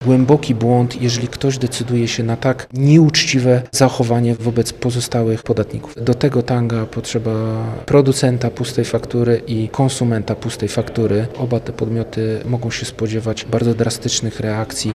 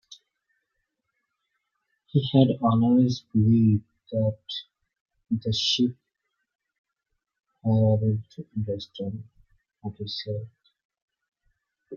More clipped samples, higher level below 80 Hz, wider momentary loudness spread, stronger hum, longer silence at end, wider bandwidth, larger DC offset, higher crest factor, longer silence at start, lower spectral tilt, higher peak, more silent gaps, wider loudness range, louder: neither; first, -44 dBFS vs -64 dBFS; second, 8 LU vs 15 LU; neither; about the same, 0.05 s vs 0 s; first, 14 kHz vs 7.2 kHz; neither; second, 16 dB vs 22 dB; about the same, 0 s vs 0.1 s; second, -5.5 dB/octave vs -7.5 dB/octave; first, 0 dBFS vs -6 dBFS; second, none vs 5.00-5.05 s, 6.55-6.59 s, 6.78-6.84 s, 10.85-10.90 s, 11.02-11.08 s; second, 5 LU vs 10 LU; first, -17 LUFS vs -25 LUFS